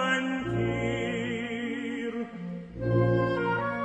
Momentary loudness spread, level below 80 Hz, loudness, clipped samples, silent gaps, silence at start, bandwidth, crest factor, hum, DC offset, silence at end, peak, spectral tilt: 10 LU; -50 dBFS; -29 LUFS; under 0.1%; none; 0 s; 8.8 kHz; 14 dB; none; under 0.1%; 0 s; -14 dBFS; -6.5 dB/octave